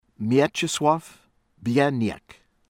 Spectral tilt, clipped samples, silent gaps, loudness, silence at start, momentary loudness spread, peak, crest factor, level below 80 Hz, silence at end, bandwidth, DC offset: -5 dB/octave; under 0.1%; none; -23 LUFS; 0.2 s; 9 LU; -6 dBFS; 18 dB; -60 dBFS; 0.5 s; 16.5 kHz; under 0.1%